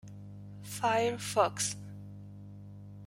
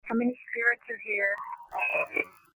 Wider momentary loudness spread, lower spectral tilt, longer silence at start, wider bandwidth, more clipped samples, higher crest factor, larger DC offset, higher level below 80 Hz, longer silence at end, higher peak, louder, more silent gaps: first, 20 LU vs 6 LU; second, -3.5 dB/octave vs -6 dB/octave; about the same, 0.05 s vs 0.05 s; second, 16 kHz vs over 20 kHz; neither; about the same, 22 dB vs 18 dB; neither; first, -66 dBFS vs -74 dBFS; second, 0 s vs 0.25 s; about the same, -12 dBFS vs -12 dBFS; second, -32 LUFS vs -29 LUFS; neither